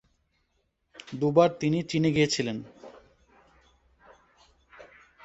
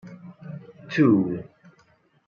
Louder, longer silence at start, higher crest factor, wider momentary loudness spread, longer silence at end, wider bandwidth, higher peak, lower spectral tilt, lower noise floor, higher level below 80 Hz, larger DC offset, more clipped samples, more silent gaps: second, -26 LUFS vs -22 LUFS; first, 1.05 s vs 0.05 s; about the same, 24 dB vs 20 dB; second, 20 LU vs 23 LU; second, 0.4 s vs 0.85 s; first, 8.2 kHz vs 6.8 kHz; about the same, -6 dBFS vs -6 dBFS; second, -5.5 dB/octave vs -8.5 dB/octave; first, -74 dBFS vs -62 dBFS; about the same, -64 dBFS vs -68 dBFS; neither; neither; neither